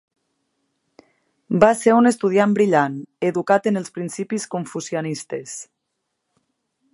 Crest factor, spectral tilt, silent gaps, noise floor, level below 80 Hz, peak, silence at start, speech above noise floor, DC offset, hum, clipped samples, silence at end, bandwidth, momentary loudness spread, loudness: 22 dB; -5.5 dB/octave; none; -77 dBFS; -62 dBFS; 0 dBFS; 1.5 s; 57 dB; under 0.1%; none; under 0.1%; 1.3 s; 11.5 kHz; 14 LU; -20 LUFS